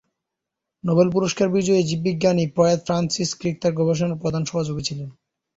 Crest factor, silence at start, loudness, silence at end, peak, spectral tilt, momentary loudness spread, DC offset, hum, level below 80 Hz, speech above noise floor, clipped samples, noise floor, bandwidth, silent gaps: 18 dB; 0.85 s; -21 LUFS; 0.45 s; -4 dBFS; -5.5 dB/octave; 8 LU; under 0.1%; none; -54 dBFS; 63 dB; under 0.1%; -84 dBFS; 8 kHz; none